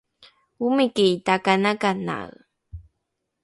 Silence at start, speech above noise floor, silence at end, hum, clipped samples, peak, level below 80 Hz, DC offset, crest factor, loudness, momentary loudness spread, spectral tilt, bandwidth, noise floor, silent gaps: 0.6 s; 57 dB; 0.65 s; none; under 0.1%; -2 dBFS; -54 dBFS; under 0.1%; 22 dB; -22 LUFS; 11 LU; -5.5 dB/octave; 11.5 kHz; -78 dBFS; none